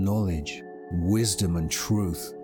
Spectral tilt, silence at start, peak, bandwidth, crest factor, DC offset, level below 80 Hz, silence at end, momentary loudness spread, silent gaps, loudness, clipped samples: -5 dB/octave; 0 s; -12 dBFS; over 20 kHz; 14 dB; under 0.1%; -44 dBFS; 0 s; 10 LU; none; -27 LUFS; under 0.1%